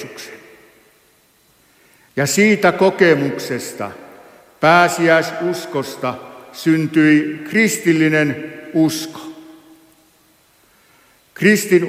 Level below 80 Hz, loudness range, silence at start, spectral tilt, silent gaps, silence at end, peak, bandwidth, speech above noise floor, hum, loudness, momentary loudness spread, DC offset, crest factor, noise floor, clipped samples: -64 dBFS; 5 LU; 0 s; -5 dB/octave; none; 0 s; 0 dBFS; 16 kHz; 40 dB; none; -16 LUFS; 17 LU; under 0.1%; 18 dB; -55 dBFS; under 0.1%